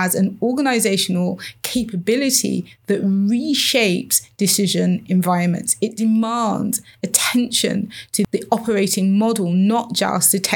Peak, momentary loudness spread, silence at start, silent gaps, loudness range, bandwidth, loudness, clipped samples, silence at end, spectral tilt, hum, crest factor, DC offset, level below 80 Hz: 0 dBFS; 7 LU; 0 s; none; 2 LU; 20 kHz; -18 LUFS; under 0.1%; 0 s; -4 dB/octave; none; 18 dB; under 0.1%; -58 dBFS